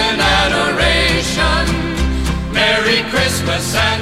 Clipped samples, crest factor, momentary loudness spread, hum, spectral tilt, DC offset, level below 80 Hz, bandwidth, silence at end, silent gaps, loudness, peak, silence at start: under 0.1%; 12 dB; 6 LU; none; -3.5 dB/octave; under 0.1%; -24 dBFS; 16 kHz; 0 s; none; -14 LUFS; -2 dBFS; 0 s